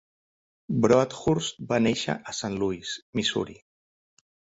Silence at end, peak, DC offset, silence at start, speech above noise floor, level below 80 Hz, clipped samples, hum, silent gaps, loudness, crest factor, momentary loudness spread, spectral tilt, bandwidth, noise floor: 1.05 s; -6 dBFS; under 0.1%; 0.7 s; over 64 dB; -56 dBFS; under 0.1%; none; 3.02-3.13 s; -26 LUFS; 22 dB; 10 LU; -5 dB/octave; 8 kHz; under -90 dBFS